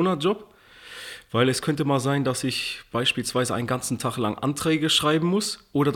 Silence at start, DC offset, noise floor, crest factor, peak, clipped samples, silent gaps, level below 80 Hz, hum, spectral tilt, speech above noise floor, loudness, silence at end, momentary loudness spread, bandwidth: 0 s; under 0.1%; -44 dBFS; 18 dB; -6 dBFS; under 0.1%; none; -58 dBFS; none; -4.5 dB/octave; 20 dB; -24 LUFS; 0 s; 9 LU; 18.5 kHz